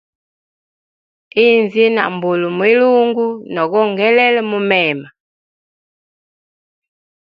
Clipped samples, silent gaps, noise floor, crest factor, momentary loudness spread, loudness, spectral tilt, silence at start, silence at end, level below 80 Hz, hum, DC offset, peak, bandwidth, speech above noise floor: under 0.1%; none; under -90 dBFS; 16 dB; 8 LU; -14 LUFS; -7.5 dB/octave; 1.35 s; 2.15 s; -68 dBFS; none; under 0.1%; 0 dBFS; 5.2 kHz; over 77 dB